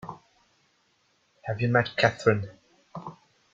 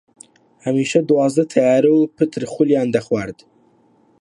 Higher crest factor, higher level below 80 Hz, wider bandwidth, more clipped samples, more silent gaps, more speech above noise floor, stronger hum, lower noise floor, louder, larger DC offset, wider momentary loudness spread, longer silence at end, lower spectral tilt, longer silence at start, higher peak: first, 24 dB vs 16 dB; about the same, -64 dBFS vs -60 dBFS; second, 7.8 kHz vs 11.5 kHz; neither; neither; first, 44 dB vs 39 dB; neither; first, -69 dBFS vs -56 dBFS; second, -25 LUFS vs -17 LUFS; neither; first, 21 LU vs 9 LU; second, 0.4 s vs 0.9 s; about the same, -6 dB/octave vs -6.5 dB/octave; second, 0.05 s vs 0.65 s; second, -6 dBFS vs -2 dBFS